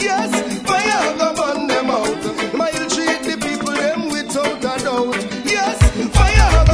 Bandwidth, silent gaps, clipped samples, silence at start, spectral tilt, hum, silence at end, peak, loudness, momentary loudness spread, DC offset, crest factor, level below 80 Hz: 11 kHz; none; under 0.1%; 0 s; -4.5 dB/octave; none; 0 s; 0 dBFS; -17 LUFS; 7 LU; under 0.1%; 16 dB; -22 dBFS